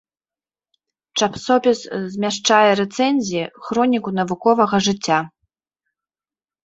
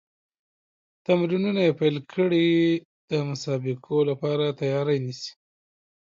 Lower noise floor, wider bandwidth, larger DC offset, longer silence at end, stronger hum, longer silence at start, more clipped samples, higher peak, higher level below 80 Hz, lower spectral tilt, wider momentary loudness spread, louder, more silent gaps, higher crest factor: about the same, under -90 dBFS vs under -90 dBFS; about the same, 8 kHz vs 7.6 kHz; neither; first, 1.35 s vs 0.8 s; neither; about the same, 1.15 s vs 1.1 s; neither; first, -2 dBFS vs -8 dBFS; first, -60 dBFS vs -72 dBFS; second, -4 dB/octave vs -7 dB/octave; about the same, 10 LU vs 9 LU; first, -18 LUFS vs -24 LUFS; second, none vs 2.85-3.08 s; about the same, 18 dB vs 16 dB